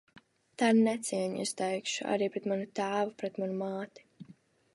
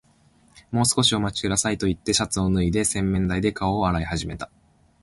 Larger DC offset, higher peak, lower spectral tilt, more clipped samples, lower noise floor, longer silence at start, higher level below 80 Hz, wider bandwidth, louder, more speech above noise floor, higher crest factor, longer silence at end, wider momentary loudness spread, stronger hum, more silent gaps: neither; second, -14 dBFS vs -6 dBFS; about the same, -4.5 dB/octave vs -4 dB/octave; neither; about the same, -60 dBFS vs -58 dBFS; about the same, 0.6 s vs 0.55 s; second, -82 dBFS vs -40 dBFS; about the same, 11.5 kHz vs 12 kHz; second, -32 LUFS vs -23 LUFS; second, 28 dB vs 36 dB; about the same, 18 dB vs 18 dB; second, 0.4 s vs 0.55 s; about the same, 10 LU vs 9 LU; neither; neither